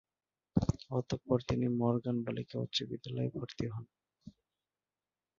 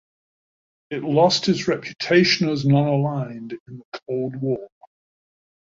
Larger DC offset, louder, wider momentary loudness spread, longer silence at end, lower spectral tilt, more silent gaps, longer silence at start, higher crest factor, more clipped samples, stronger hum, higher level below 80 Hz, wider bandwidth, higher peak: neither; second, -36 LUFS vs -21 LUFS; second, 8 LU vs 18 LU; about the same, 1.1 s vs 1.1 s; about the same, -6.5 dB/octave vs -5.5 dB/octave; second, none vs 3.60-3.66 s, 3.85-3.92 s; second, 0.55 s vs 0.9 s; about the same, 22 dB vs 20 dB; neither; neither; first, -56 dBFS vs -62 dBFS; about the same, 7.2 kHz vs 7.8 kHz; second, -16 dBFS vs -4 dBFS